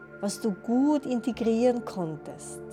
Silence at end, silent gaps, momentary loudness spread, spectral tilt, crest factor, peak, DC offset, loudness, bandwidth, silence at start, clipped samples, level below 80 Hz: 0 s; none; 14 LU; -6 dB/octave; 16 dB; -12 dBFS; under 0.1%; -27 LUFS; 14.5 kHz; 0 s; under 0.1%; -62 dBFS